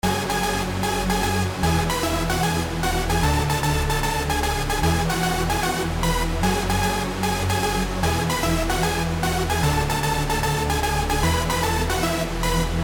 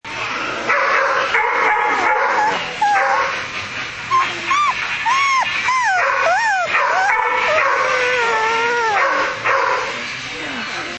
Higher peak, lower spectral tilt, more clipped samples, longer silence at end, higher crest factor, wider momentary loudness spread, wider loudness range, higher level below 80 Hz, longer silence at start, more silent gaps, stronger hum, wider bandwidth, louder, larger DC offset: second, -10 dBFS vs -2 dBFS; first, -4.5 dB/octave vs -1.5 dB/octave; neither; about the same, 0 s vs 0 s; about the same, 12 dB vs 16 dB; second, 2 LU vs 8 LU; about the same, 1 LU vs 2 LU; first, -28 dBFS vs -54 dBFS; about the same, 0.05 s vs 0.05 s; neither; neither; first, 18 kHz vs 8.8 kHz; second, -22 LUFS vs -16 LUFS; neither